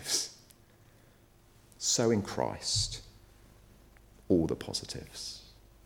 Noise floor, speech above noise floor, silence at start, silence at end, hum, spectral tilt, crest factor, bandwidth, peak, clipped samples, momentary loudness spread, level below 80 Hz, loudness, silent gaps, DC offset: -61 dBFS; 29 dB; 0 s; 0.35 s; none; -3.5 dB/octave; 22 dB; 19 kHz; -14 dBFS; under 0.1%; 14 LU; -54 dBFS; -32 LUFS; none; under 0.1%